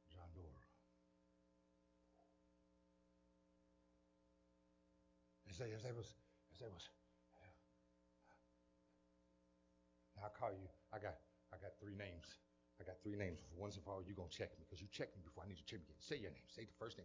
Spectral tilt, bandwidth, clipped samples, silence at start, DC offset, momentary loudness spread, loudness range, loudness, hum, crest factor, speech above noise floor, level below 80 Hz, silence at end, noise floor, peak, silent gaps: -5.5 dB/octave; 7.8 kHz; under 0.1%; 0.05 s; under 0.1%; 11 LU; 13 LU; -54 LUFS; 60 Hz at -80 dBFS; 26 dB; 26 dB; -70 dBFS; 0 s; -79 dBFS; -30 dBFS; none